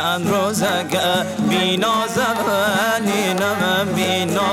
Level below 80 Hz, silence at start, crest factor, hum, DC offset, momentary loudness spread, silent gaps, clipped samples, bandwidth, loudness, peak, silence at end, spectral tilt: -56 dBFS; 0 s; 14 dB; none; under 0.1%; 2 LU; none; under 0.1%; 17.5 kHz; -18 LUFS; -6 dBFS; 0 s; -4 dB/octave